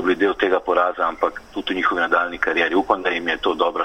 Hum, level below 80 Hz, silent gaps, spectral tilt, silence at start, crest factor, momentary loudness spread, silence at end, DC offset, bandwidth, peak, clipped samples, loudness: none; -50 dBFS; none; -4.5 dB/octave; 0 s; 18 dB; 5 LU; 0 s; under 0.1%; 9.2 kHz; -2 dBFS; under 0.1%; -20 LUFS